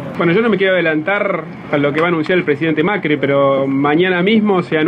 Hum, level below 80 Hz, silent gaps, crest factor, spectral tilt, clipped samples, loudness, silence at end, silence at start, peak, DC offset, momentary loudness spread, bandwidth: none; -56 dBFS; none; 12 dB; -8 dB/octave; under 0.1%; -14 LUFS; 0 s; 0 s; -2 dBFS; under 0.1%; 4 LU; 8.8 kHz